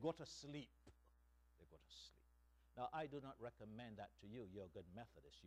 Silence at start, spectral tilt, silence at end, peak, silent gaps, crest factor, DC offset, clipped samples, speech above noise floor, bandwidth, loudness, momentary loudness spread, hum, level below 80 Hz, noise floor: 0 s; -5.5 dB/octave; 0 s; -32 dBFS; none; 22 dB; under 0.1%; under 0.1%; 21 dB; 13 kHz; -55 LUFS; 14 LU; 60 Hz at -75 dBFS; -74 dBFS; -75 dBFS